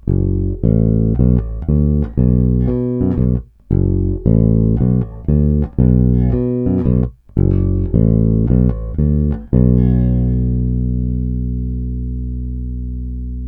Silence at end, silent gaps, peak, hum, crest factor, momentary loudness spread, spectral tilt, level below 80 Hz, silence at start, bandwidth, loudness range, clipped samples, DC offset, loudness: 0 s; none; 0 dBFS; 60 Hz at -35 dBFS; 14 dB; 9 LU; -14 dB/octave; -20 dBFS; 0.05 s; 2.5 kHz; 2 LU; under 0.1%; under 0.1%; -16 LUFS